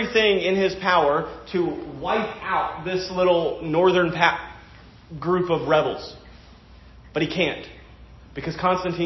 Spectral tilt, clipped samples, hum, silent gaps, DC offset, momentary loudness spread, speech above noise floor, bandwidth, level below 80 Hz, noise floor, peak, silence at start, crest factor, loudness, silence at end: -6 dB/octave; under 0.1%; none; none; under 0.1%; 14 LU; 25 dB; 6.2 kHz; -48 dBFS; -47 dBFS; -4 dBFS; 0 s; 20 dB; -22 LUFS; 0 s